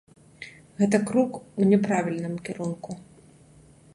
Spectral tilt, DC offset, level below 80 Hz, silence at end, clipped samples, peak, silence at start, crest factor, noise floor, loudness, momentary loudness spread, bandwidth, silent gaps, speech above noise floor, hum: -7 dB/octave; under 0.1%; -64 dBFS; 0.9 s; under 0.1%; -6 dBFS; 0.4 s; 20 dB; -53 dBFS; -25 LUFS; 21 LU; 11.5 kHz; none; 29 dB; none